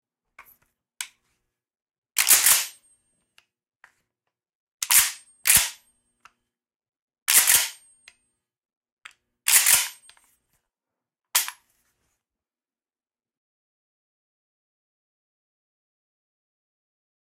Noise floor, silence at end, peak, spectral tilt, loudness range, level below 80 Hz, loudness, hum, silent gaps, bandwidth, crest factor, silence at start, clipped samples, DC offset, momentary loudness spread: under -90 dBFS; 5.9 s; -4 dBFS; 2.5 dB/octave; 12 LU; -62 dBFS; -19 LUFS; none; 1.82-1.86 s, 1.98-2.02 s, 4.55-4.78 s, 6.76-6.80 s, 7.02-7.08 s, 7.22-7.26 s, 8.77-8.81 s, 8.92-8.97 s; 16 kHz; 24 dB; 1 s; under 0.1%; under 0.1%; 18 LU